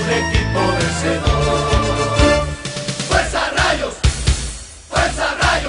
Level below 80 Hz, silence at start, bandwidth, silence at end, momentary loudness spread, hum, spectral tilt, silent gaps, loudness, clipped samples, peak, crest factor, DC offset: -24 dBFS; 0 s; 11 kHz; 0 s; 8 LU; none; -4 dB/octave; none; -17 LUFS; under 0.1%; 0 dBFS; 16 dB; under 0.1%